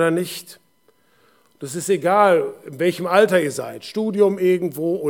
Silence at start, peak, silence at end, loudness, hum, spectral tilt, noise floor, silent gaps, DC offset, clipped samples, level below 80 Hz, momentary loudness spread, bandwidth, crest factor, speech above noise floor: 0 s; -2 dBFS; 0 s; -19 LUFS; none; -5 dB/octave; -61 dBFS; none; under 0.1%; under 0.1%; -80 dBFS; 14 LU; 18.5 kHz; 18 dB; 42 dB